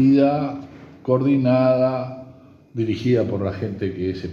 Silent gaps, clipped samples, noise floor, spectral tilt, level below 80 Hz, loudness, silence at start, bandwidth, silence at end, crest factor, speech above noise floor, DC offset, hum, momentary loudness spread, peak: none; under 0.1%; -46 dBFS; -9 dB/octave; -58 dBFS; -21 LUFS; 0 s; 6.6 kHz; 0 s; 14 dB; 27 dB; under 0.1%; none; 17 LU; -6 dBFS